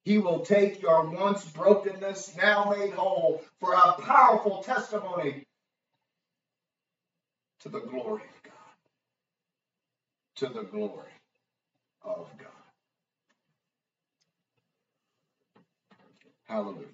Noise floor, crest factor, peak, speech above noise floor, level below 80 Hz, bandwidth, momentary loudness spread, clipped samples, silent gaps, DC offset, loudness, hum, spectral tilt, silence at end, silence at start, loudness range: -89 dBFS; 24 dB; -4 dBFS; 63 dB; under -90 dBFS; 8 kHz; 18 LU; under 0.1%; none; under 0.1%; -26 LUFS; none; -3.5 dB/octave; 0.05 s; 0.05 s; 22 LU